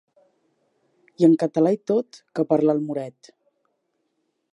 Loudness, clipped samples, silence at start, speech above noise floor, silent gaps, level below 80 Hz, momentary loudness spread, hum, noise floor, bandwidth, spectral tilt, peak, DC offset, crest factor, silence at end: -21 LUFS; under 0.1%; 1.2 s; 53 dB; none; -78 dBFS; 13 LU; none; -74 dBFS; 9.4 kHz; -8.5 dB/octave; -6 dBFS; under 0.1%; 18 dB; 1.4 s